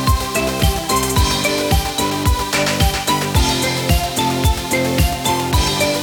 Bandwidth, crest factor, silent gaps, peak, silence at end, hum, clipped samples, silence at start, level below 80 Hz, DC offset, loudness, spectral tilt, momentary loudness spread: 19.5 kHz; 14 dB; none; -2 dBFS; 0 s; none; under 0.1%; 0 s; -22 dBFS; under 0.1%; -17 LUFS; -4 dB/octave; 2 LU